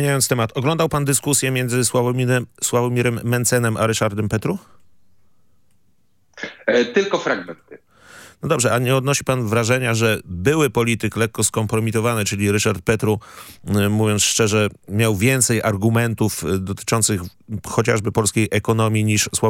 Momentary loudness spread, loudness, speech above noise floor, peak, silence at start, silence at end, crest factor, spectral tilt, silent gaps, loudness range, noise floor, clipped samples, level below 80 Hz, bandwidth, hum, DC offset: 7 LU; -19 LUFS; 46 dB; 0 dBFS; 0 s; 0 s; 18 dB; -4.5 dB/octave; none; 6 LU; -65 dBFS; under 0.1%; -52 dBFS; 17 kHz; none; under 0.1%